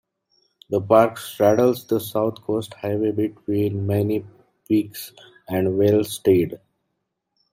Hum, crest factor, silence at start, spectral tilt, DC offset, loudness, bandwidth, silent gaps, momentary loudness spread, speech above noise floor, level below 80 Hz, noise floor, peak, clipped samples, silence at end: none; 20 dB; 0.7 s; -7 dB/octave; under 0.1%; -21 LUFS; 16.5 kHz; none; 11 LU; 56 dB; -62 dBFS; -77 dBFS; -2 dBFS; under 0.1%; 0.95 s